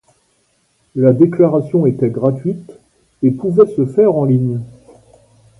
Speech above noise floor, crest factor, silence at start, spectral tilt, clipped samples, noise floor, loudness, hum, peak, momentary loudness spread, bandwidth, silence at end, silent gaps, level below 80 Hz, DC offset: 47 dB; 14 dB; 0.95 s; -11.5 dB/octave; under 0.1%; -60 dBFS; -14 LUFS; none; 0 dBFS; 13 LU; 11 kHz; 0.9 s; none; -54 dBFS; under 0.1%